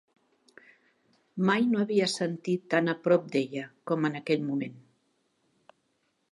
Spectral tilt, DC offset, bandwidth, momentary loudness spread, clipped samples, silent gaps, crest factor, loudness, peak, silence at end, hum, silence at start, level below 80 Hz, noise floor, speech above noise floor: -5.5 dB/octave; under 0.1%; 11.5 kHz; 9 LU; under 0.1%; none; 20 dB; -28 LUFS; -10 dBFS; 1.55 s; none; 1.35 s; -80 dBFS; -75 dBFS; 47 dB